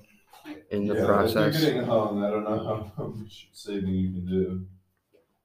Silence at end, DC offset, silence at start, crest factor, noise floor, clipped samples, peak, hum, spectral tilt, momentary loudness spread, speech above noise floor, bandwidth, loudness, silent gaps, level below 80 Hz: 0.7 s; under 0.1%; 0.45 s; 20 dB; -66 dBFS; under 0.1%; -8 dBFS; none; -6.5 dB/octave; 19 LU; 40 dB; 15.5 kHz; -27 LUFS; none; -60 dBFS